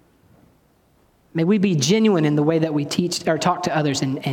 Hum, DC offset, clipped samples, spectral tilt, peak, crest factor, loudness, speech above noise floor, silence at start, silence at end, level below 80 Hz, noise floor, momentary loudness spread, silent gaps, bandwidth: none; under 0.1%; under 0.1%; -5.5 dB/octave; -4 dBFS; 16 dB; -20 LUFS; 40 dB; 1.35 s; 0 s; -62 dBFS; -59 dBFS; 6 LU; none; 16.5 kHz